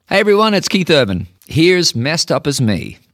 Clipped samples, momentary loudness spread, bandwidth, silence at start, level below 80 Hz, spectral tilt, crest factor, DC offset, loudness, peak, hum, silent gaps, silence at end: under 0.1%; 9 LU; 16.5 kHz; 0.1 s; -46 dBFS; -4.5 dB/octave; 14 dB; under 0.1%; -14 LUFS; 0 dBFS; none; none; 0.2 s